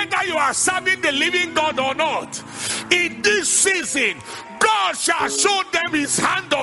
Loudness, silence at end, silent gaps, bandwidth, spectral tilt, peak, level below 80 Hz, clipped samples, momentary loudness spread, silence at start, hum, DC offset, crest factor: -18 LUFS; 0 s; none; 12 kHz; -1 dB/octave; 0 dBFS; -58 dBFS; under 0.1%; 8 LU; 0 s; none; under 0.1%; 20 dB